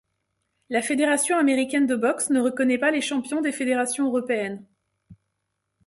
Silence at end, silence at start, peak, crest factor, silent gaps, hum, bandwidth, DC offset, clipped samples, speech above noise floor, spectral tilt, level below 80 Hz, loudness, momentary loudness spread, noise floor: 0.7 s; 0.7 s; -10 dBFS; 16 dB; none; none; 12 kHz; under 0.1%; under 0.1%; 56 dB; -3 dB/octave; -68 dBFS; -23 LUFS; 6 LU; -78 dBFS